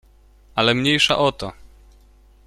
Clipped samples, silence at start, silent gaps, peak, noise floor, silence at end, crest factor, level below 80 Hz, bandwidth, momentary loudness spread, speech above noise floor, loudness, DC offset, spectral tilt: under 0.1%; 0.55 s; none; -2 dBFS; -51 dBFS; 0.8 s; 20 dB; -48 dBFS; 14 kHz; 16 LU; 32 dB; -18 LUFS; under 0.1%; -4 dB/octave